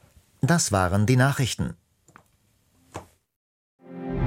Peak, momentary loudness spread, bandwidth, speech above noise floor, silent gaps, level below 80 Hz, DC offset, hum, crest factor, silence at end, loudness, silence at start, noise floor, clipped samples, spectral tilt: -6 dBFS; 23 LU; 16.5 kHz; 43 dB; 3.36-3.79 s; -48 dBFS; under 0.1%; none; 20 dB; 0 s; -23 LUFS; 0.45 s; -65 dBFS; under 0.1%; -5 dB/octave